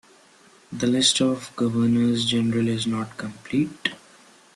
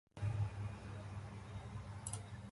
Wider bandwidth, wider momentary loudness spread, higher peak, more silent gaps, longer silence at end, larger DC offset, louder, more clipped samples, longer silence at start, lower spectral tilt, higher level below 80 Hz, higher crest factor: about the same, 12 kHz vs 11.5 kHz; about the same, 11 LU vs 9 LU; first, -4 dBFS vs -28 dBFS; neither; first, 0.6 s vs 0 s; neither; first, -23 LUFS vs -46 LUFS; neither; first, 0.7 s vs 0.15 s; second, -4 dB/octave vs -5.5 dB/octave; about the same, -60 dBFS vs -56 dBFS; about the same, 20 dB vs 18 dB